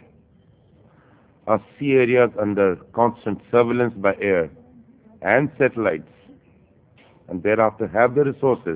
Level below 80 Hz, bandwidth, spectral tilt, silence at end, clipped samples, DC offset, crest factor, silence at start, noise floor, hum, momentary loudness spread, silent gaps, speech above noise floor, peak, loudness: -56 dBFS; 4 kHz; -11 dB/octave; 0 s; under 0.1%; under 0.1%; 20 dB; 1.45 s; -55 dBFS; none; 9 LU; none; 35 dB; -2 dBFS; -20 LUFS